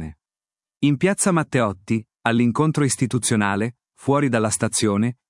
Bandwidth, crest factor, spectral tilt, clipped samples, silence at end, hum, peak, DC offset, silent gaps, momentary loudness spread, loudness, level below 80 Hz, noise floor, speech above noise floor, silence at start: 12 kHz; 20 dB; -5 dB/octave; under 0.1%; 0.15 s; none; 0 dBFS; under 0.1%; none; 7 LU; -21 LUFS; -56 dBFS; under -90 dBFS; over 70 dB; 0 s